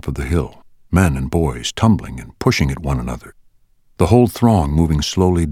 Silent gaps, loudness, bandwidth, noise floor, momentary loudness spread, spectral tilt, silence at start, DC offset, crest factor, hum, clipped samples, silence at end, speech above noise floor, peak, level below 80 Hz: none; -17 LUFS; 16 kHz; -53 dBFS; 9 LU; -6.5 dB/octave; 0.05 s; under 0.1%; 16 dB; none; under 0.1%; 0 s; 37 dB; 0 dBFS; -28 dBFS